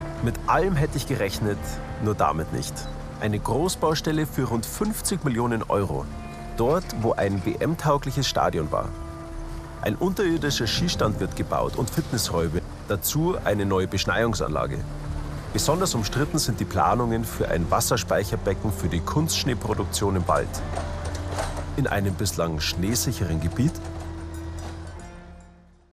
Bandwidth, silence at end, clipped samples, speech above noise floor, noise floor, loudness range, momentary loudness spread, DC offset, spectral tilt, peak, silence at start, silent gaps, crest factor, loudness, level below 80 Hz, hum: 15.5 kHz; 0.4 s; under 0.1%; 27 dB; -51 dBFS; 2 LU; 12 LU; under 0.1%; -5 dB/octave; -6 dBFS; 0 s; none; 18 dB; -25 LUFS; -38 dBFS; none